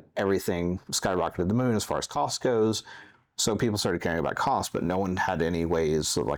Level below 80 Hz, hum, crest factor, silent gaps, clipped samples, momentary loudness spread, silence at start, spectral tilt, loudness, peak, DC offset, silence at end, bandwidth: -54 dBFS; none; 14 dB; none; under 0.1%; 3 LU; 0.15 s; -4.5 dB/octave; -27 LUFS; -14 dBFS; under 0.1%; 0 s; over 20 kHz